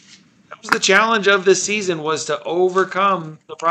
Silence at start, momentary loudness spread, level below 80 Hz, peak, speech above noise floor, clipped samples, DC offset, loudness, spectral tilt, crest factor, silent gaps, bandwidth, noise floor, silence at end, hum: 0.5 s; 9 LU; -68 dBFS; 0 dBFS; 31 dB; under 0.1%; under 0.1%; -17 LUFS; -3 dB/octave; 18 dB; none; 12.5 kHz; -49 dBFS; 0 s; none